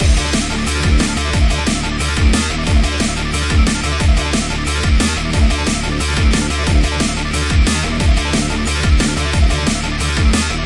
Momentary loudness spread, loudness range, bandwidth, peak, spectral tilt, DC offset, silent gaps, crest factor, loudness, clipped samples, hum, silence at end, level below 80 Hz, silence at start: 3 LU; 0 LU; 11.5 kHz; 0 dBFS; -4.5 dB/octave; 0.4%; none; 14 dB; -16 LUFS; under 0.1%; none; 0 s; -18 dBFS; 0 s